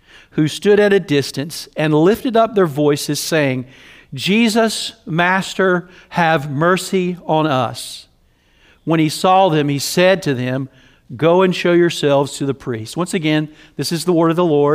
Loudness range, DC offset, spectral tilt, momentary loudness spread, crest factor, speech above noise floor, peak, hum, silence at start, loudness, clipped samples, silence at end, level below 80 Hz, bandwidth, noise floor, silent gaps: 2 LU; under 0.1%; -5 dB/octave; 11 LU; 16 dB; 39 dB; 0 dBFS; none; 0.35 s; -16 LUFS; under 0.1%; 0 s; -54 dBFS; 16 kHz; -55 dBFS; none